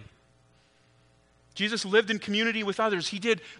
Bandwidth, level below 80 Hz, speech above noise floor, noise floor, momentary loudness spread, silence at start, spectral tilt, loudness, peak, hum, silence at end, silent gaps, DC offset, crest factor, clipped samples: 10.5 kHz; -70 dBFS; 35 dB; -63 dBFS; 5 LU; 0 s; -3.5 dB/octave; -27 LUFS; -10 dBFS; 60 Hz at -65 dBFS; 0.05 s; none; under 0.1%; 20 dB; under 0.1%